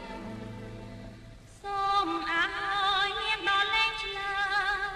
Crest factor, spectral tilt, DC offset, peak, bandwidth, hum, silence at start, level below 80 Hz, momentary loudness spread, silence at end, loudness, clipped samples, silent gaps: 16 dB; -3 dB/octave; under 0.1%; -14 dBFS; 13.5 kHz; none; 0 s; -52 dBFS; 18 LU; 0 s; -28 LUFS; under 0.1%; none